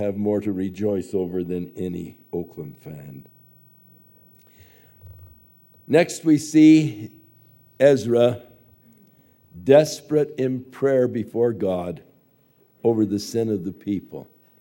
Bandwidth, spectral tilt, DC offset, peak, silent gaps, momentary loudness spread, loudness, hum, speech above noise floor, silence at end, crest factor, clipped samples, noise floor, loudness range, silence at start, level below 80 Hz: 16.5 kHz; -6.5 dB/octave; under 0.1%; -2 dBFS; none; 21 LU; -21 LUFS; none; 39 dB; 0.4 s; 20 dB; under 0.1%; -60 dBFS; 14 LU; 0 s; -62 dBFS